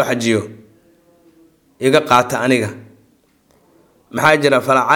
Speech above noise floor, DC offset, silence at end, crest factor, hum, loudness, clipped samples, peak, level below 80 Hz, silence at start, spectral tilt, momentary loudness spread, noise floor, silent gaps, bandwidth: 42 dB; under 0.1%; 0 s; 18 dB; none; -15 LUFS; under 0.1%; 0 dBFS; -60 dBFS; 0 s; -4.5 dB/octave; 12 LU; -56 dBFS; none; 19 kHz